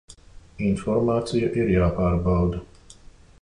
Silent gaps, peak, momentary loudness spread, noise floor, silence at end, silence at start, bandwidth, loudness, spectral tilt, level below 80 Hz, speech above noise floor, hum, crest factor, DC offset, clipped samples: none; -10 dBFS; 6 LU; -48 dBFS; 0.5 s; 0.1 s; 11 kHz; -23 LUFS; -8 dB/octave; -36 dBFS; 26 dB; none; 14 dB; under 0.1%; under 0.1%